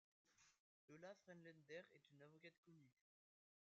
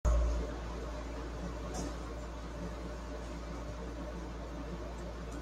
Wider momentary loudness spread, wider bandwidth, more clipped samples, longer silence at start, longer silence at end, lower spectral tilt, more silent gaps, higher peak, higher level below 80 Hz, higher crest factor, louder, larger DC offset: about the same, 6 LU vs 6 LU; second, 7.4 kHz vs 10 kHz; neither; first, 0.25 s vs 0.05 s; first, 0.8 s vs 0 s; second, -4 dB/octave vs -6 dB/octave; first, 0.59-0.88 s, 2.58-2.63 s vs none; second, -46 dBFS vs -20 dBFS; second, under -90 dBFS vs -40 dBFS; about the same, 22 dB vs 18 dB; second, -63 LUFS vs -41 LUFS; neither